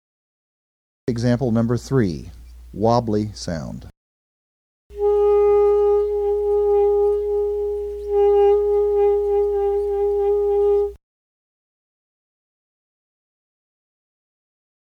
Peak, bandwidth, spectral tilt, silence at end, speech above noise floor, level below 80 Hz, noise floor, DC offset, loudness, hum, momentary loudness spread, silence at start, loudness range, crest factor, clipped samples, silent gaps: -4 dBFS; 8.6 kHz; -7.5 dB/octave; 4 s; over 69 dB; -44 dBFS; under -90 dBFS; under 0.1%; -19 LUFS; none; 12 LU; 1.05 s; 6 LU; 18 dB; under 0.1%; 3.97-4.90 s